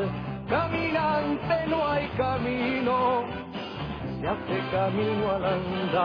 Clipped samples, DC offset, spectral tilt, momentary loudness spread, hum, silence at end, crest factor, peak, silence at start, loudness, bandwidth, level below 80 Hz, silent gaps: under 0.1%; under 0.1%; -8.5 dB/octave; 9 LU; none; 0 s; 14 dB; -12 dBFS; 0 s; -27 LUFS; 5.4 kHz; -48 dBFS; none